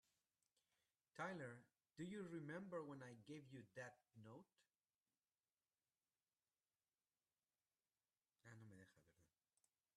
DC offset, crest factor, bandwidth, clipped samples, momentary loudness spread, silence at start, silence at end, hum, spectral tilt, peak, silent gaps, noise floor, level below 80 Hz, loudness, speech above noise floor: under 0.1%; 24 dB; 11.5 kHz; under 0.1%; 14 LU; 1.15 s; 0.7 s; none; -6 dB/octave; -38 dBFS; 4.94-5.01 s; under -90 dBFS; under -90 dBFS; -57 LUFS; over 34 dB